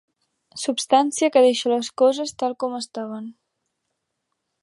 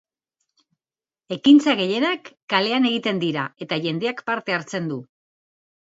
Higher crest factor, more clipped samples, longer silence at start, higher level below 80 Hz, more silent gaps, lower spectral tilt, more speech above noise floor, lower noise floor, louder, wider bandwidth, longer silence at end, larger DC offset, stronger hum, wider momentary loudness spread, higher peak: about the same, 20 dB vs 18 dB; neither; second, 0.55 s vs 1.3 s; about the same, -76 dBFS vs -72 dBFS; second, none vs 2.42-2.48 s; second, -2.5 dB/octave vs -5.5 dB/octave; second, 57 dB vs over 69 dB; second, -78 dBFS vs under -90 dBFS; about the same, -21 LUFS vs -21 LUFS; first, 11.5 kHz vs 8 kHz; first, 1.3 s vs 0.95 s; neither; neither; first, 16 LU vs 13 LU; about the same, -4 dBFS vs -4 dBFS